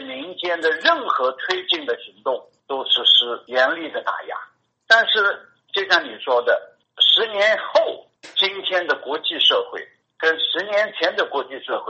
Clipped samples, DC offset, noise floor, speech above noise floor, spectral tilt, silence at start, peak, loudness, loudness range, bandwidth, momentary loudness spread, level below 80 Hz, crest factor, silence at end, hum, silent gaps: under 0.1%; under 0.1%; -44 dBFS; 24 dB; -1 dB/octave; 0 s; 0 dBFS; -19 LUFS; 2 LU; 8.2 kHz; 14 LU; -76 dBFS; 20 dB; 0 s; none; none